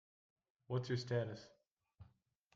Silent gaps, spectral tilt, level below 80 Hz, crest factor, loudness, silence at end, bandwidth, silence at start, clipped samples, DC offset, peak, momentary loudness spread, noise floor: 1.67-1.76 s; -6.5 dB/octave; -78 dBFS; 18 dB; -42 LUFS; 0.5 s; 7.6 kHz; 0.7 s; under 0.1%; under 0.1%; -28 dBFS; 9 LU; -74 dBFS